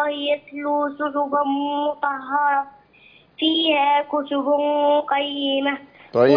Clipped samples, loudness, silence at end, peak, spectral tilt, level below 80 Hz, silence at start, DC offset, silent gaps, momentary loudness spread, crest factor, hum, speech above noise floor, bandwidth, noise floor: under 0.1%; -21 LUFS; 0 s; -4 dBFS; -7 dB/octave; -68 dBFS; 0 s; under 0.1%; none; 7 LU; 18 dB; none; 31 dB; 5.2 kHz; -52 dBFS